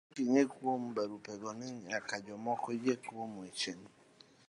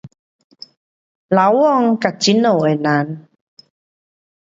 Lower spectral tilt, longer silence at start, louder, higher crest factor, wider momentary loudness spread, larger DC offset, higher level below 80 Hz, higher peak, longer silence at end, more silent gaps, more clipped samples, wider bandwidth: about the same, -4.5 dB/octave vs -5.5 dB/octave; about the same, 0.15 s vs 0.05 s; second, -37 LUFS vs -15 LUFS; about the same, 22 dB vs 18 dB; first, 13 LU vs 7 LU; neither; second, -82 dBFS vs -66 dBFS; second, -16 dBFS vs 0 dBFS; second, 0.6 s vs 1.4 s; second, none vs 0.19-0.50 s, 0.77-1.29 s; neither; first, 11.5 kHz vs 7.8 kHz